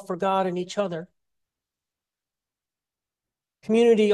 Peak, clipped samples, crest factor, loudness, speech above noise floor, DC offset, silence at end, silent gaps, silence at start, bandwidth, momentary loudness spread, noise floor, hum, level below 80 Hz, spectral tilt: -8 dBFS; under 0.1%; 18 dB; -24 LUFS; over 68 dB; under 0.1%; 0 s; none; 0 s; 11.5 kHz; 15 LU; under -90 dBFS; none; -74 dBFS; -6 dB/octave